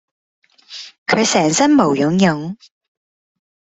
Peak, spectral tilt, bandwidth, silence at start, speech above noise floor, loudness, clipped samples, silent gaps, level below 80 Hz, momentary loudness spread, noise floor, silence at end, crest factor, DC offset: -2 dBFS; -4.5 dB/octave; 8.4 kHz; 0.7 s; 22 dB; -15 LUFS; under 0.1%; 0.98-1.06 s; -58 dBFS; 20 LU; -37 dBFS; 1.2 s; 18 dB; under 0.1%